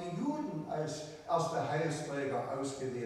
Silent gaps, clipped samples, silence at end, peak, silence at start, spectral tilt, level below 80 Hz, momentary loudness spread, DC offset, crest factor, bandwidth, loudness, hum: none; under 0.1%; 0 s; -20 dBFS; 0 s; -5.5 dB/octave; -70 dBFS; 5 LU; under 0.1%; 16 dB; 13.5 kHz; -36 LUFS; none